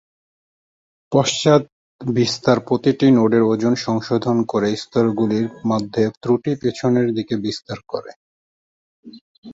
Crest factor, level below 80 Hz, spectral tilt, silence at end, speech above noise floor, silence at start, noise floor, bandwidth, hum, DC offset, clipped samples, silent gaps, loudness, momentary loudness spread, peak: 18 dB; -56 dBFS; -6 dB/octave; 0 s; over 72 dB; 1.1 s; under -90 dBFS; 8 kHz; none; under 0.1%; under 0.1%; 1.72-1.99 s, 6.17-6.21 s, 8.16-9.03 s, 9.21-9.42 s; -19 LUFS; 11 LU; -2 dBFS